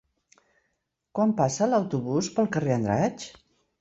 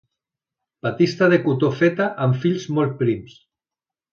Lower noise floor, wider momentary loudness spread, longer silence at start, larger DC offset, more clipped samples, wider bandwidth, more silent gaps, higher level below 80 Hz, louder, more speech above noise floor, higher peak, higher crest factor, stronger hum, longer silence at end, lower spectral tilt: second, -77 dBFS vs -90 dBFS; about the same, 9 LU vs 8 LU; first, 1.15 s vs 0.85 s; neither; neither; first, 8 kHz vs 7 kHz; neither; about the same, -60 dBFS vs -60 dBFS; second, -26 LUFS vs -20 LUFS; second, 53 dB vs 71 dB; second, -8 dBFS vs -4 dBFS; about the same, 18 dB vs 16 dB; neither; second, 0.5 s vs 0.85 s; second, -6 dB/octave vs -7.5 dB/octave